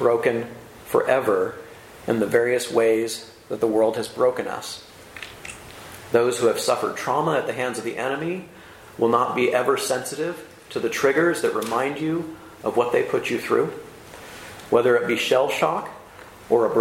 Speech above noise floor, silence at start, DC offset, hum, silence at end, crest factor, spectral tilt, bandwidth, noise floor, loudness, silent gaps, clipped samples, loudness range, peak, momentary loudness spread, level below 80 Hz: 22 dB; 0 s; under 0.1%; none; 0 s; 20 dB; -4.5 dB/octave; 16.5 kHz; -44 dBFS; -22 LUFS; none; under 0.1%; 2 LU; -4 dBFS; 19 LU; -60 dBFS